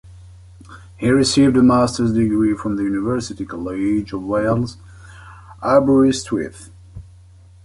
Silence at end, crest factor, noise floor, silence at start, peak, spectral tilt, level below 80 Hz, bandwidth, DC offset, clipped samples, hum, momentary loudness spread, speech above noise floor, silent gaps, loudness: 0.6 s; 16 dB; -45 dBFS; 0.05 s; -2 dBFS; -6 dB/octave; -42 dBFS; 11.5 kHz; under 0.1%; under 0.1%; none; 13 LU; 28 dB; none; -18 LUFS